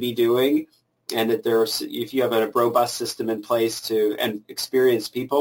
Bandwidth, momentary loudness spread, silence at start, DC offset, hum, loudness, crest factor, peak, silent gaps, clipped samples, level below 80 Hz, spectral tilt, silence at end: 17 kHz; 7 LU; 0 s; under 0.1%; none; -22 LUFS; 14 dB; -8 dBFS; none; under 0.1%; -68 dBFS; -4 dB/octave; 0 s